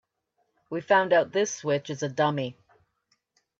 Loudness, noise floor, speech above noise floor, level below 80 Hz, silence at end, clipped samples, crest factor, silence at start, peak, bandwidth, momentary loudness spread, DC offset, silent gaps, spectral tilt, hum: -26 LUFS; -75 dBFS; 50 dB; -76 dBFS; 1.1 s; under 0.1%; 20 dB; 0.7 s; -8 dBFS; 7.8 kHz; 15 LU; under 0.1%; none; -4.5 dB/octave; none